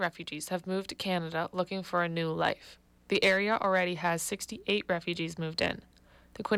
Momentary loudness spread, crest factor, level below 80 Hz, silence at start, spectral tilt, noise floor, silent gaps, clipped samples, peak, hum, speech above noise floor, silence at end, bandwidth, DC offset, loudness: 9 LU; 16 dB; -64 dBFS; 0 s; -4 dB/octave; -56 dBFS; none; under 0.1%; -16 dBFS; none; 25 dB; 0 s; 16 kHz; under 0.1%; -31 LUFS